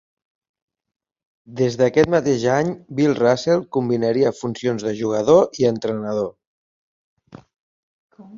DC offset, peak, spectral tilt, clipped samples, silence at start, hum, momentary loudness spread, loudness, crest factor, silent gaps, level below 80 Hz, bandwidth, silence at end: under 0.1%; -2 dBFS; -6 dB/octave; under 0.1%; 1.5 s; none; 9 LU; -19 LUFS; 20 dB; 6.47-7.17 s, 7.59-8.10 s; -56 dBFS; 7.6 kHz; 0 s